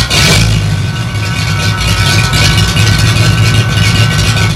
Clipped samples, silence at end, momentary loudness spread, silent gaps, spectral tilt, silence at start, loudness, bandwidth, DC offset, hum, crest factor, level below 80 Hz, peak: 0.2%; 0 s; 7 LU; none; -4 dB/octave; 0 s; -9 LUFS; 15.5 kHz; under 0.1%; none; 8 dB; -20 dBFS; 0 dBFS